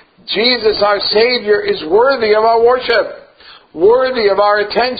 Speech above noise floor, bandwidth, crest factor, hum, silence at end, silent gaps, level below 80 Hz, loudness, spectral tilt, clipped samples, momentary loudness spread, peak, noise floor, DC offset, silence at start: 29 dB; 5 kHz; 12 dB; none; 0 s; none; -48 dBFS; -12 LUFS; -6.5 dB/octave; under 0.1%; 4 LU; 0 dBFS; -41 dBFS; under 0.1%; 0.25 s